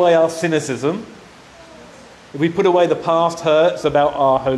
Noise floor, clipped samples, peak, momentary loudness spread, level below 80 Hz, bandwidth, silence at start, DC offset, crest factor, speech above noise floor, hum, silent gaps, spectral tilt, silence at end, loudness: -42 dBFS; under 0.1%; -4 dBFS; 8 LU; -52 dBFS; 12.5 kHz; 0 s; under 0.1%; 12 dB; 26 dB; none; none; -5.5 dB/octave; 0 s; -17 LUFS